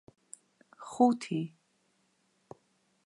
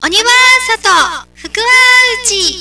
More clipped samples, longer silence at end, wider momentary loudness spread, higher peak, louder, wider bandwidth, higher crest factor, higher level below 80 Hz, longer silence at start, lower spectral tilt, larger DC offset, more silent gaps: neither; first, 1.6 s vs 0 s; first, 25 LU vs 11 LU; second, -12 dBFS vs 0 dBFS; second, -30 LUFS vs -7 LUFS; about the same, 11.5 kHz vs 11 kHz; first, 24 dB vs 10 dB; second, -82 dBFS vs -42 dBFS; first, 0.8 s vs 0 s; first, -6.5 dB/octave vs 1 dB/octave; second, under 0.1% vs 0.3%; neither